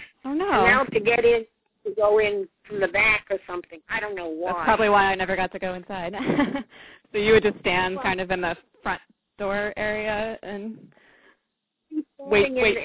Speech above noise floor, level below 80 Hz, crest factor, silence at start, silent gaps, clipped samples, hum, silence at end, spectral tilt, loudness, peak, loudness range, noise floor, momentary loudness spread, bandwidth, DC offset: 55 dB; -50 dBFS; 20 dB; 0 s; none; under 0.1%; none; 0 s; -8.5 dB/octave; -23 LUFS; -4 dBFS; 8 LU; -79 dBFS; 15 LU; 4 kHz; under 0.1%